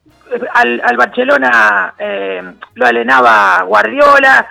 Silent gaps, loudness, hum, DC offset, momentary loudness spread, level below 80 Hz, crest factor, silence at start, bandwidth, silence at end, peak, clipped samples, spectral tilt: none; -9 LUFS; none; under 0.1%; 13 LU; -50 dBFS; 10 dB; 0.3 s; 17 kHz; 0 s; 0 dBFS; 0.9%; -3.5 dB/octave